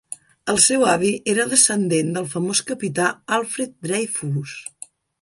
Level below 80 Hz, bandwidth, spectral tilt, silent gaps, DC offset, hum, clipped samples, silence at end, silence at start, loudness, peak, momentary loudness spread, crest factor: -62 dBFS; 11.5 kHz; -3 dB/octave; none; under 0.1%; none; under 0.1%; 0.6 s; 0.1 s; -19 LUFS; 0 dBFS; 14 LU; 22 dB